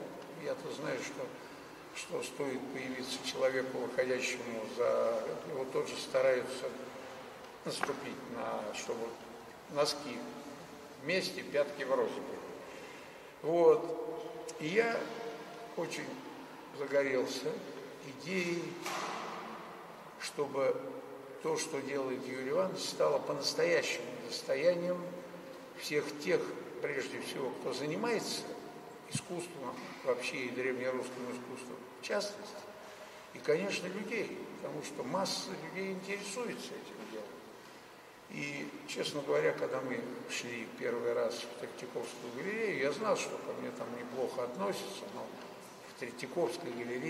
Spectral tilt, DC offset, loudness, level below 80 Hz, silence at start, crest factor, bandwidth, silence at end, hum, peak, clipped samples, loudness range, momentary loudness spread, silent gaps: -3.5 dB/octave; under 0.1%; -37 LUFS; -78 dBFS; 0 s; 24 dB; 16 kHz; 0 s; none; -14 dBFS; under 0.1%; 6 LU; 15 LU; none